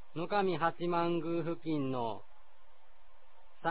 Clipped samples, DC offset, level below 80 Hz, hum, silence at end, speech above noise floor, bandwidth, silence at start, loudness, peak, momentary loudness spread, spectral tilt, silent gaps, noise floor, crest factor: under 0.1%; 0.8%; -70 dBFS; none; 0 s; 30 dB; 4 kHz; 0.15 s; -34 LUFS; -16 dBFS; 7 LU; -5 dB/octave; none; -64 dBFS; 18 dB